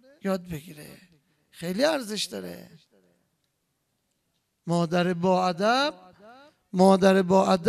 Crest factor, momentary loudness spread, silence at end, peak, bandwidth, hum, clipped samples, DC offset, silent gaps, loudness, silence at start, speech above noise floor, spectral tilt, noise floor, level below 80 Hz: 20 dB; 20 LU; 0 s; -6 dBFS; 14 kHz; none; under 0.1%; under 0.1%; none; -24 LUFS; 0.25 s; 52 dB; -5.5 dB/octave; -76 dBFS; -64 dBFS